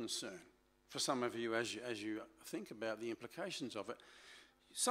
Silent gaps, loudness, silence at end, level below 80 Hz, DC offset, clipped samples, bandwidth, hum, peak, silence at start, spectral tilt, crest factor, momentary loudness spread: none; -43 LUFS; 0 s; -82 dBFS; under 0.1%; under 0.1%; 16 kHz; none; -22 dBFS; 0 s; -2.5 dB/octave; 22 dB; 17 LU